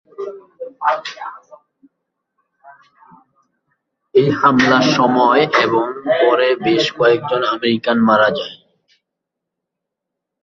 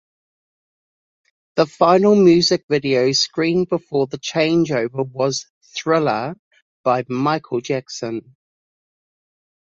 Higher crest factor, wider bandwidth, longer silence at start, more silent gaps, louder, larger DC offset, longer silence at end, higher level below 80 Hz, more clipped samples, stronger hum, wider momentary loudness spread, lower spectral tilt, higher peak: about the same, 16 dB vs 18 dB; about the same, 7.6 kHz vs 7.6 kHz; second, 0.2 s vs 1.55 s; second, none vs 2.63-2.69 s, 5.50-5.61 s, 6.39-6.51 s, 6.62-6.84 s; first, -15 LUFS vs -18 LUFS; neither; first, 1.9 s vs 1.45 s; about the same, -60 dBFS vs -60 dBFS; neither; neither; first, 18 LU vs 14 LU; about the same, -5.5 dB/octave vs -5 dB/octave; about the same, -2 dBFS vs -2 dBFS